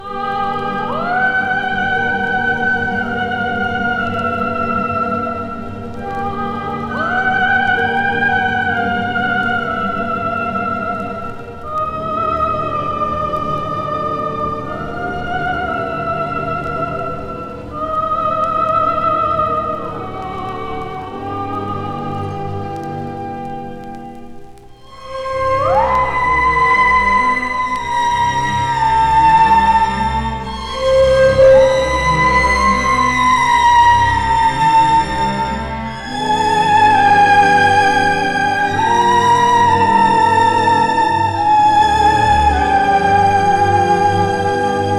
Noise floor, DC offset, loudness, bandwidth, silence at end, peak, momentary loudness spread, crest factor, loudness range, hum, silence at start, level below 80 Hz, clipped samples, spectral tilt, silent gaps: -37 dBFS; under 0.1%; -15 LUFS; 12.5 kHz; 0 s; 0 dBFS; 13 LU; 14 dB; 9 LU; none; 0 s; -34 dBFS; under 0.1%; -5 dB/octave; none